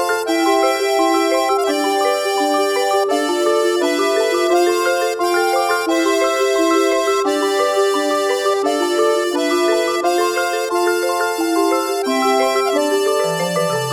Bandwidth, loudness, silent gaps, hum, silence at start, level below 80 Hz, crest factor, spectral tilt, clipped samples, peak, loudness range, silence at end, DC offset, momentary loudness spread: 17.5 kHz; -16 LUFS; none; none; 0 s; -64 dBFS; 12 dB; -3 dB/octave; under 0.1%; -4 dBFS; 1 LU; 0 s; under 0.1%; 3 LU